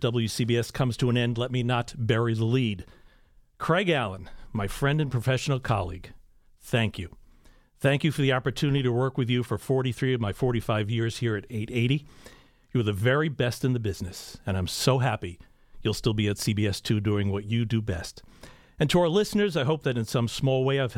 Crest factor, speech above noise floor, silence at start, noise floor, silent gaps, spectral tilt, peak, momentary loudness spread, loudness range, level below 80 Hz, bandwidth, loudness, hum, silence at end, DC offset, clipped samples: 18 dB; 32 dB; 0 s; -58 dBFS; none; -6 dB/octave; -10 dBFS; 8 LU; 2 LU; -48 dBFS; 16 kHz; -27 LUFS; none; 0 s; under 0.1%; under 0.1%